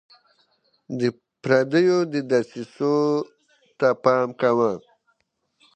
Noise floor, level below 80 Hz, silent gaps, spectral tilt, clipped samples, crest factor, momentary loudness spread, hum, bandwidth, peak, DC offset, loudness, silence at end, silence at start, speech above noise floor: -72 dBFS; -72 dBFS; none; -6.5 dB/octave; under 0.1%; 20 dB; 15 LU; none; 8.8 kHz; -4 dBFS; under 0.1%; -22 LUFS; 0.95 s; 0.9 s; 51 dB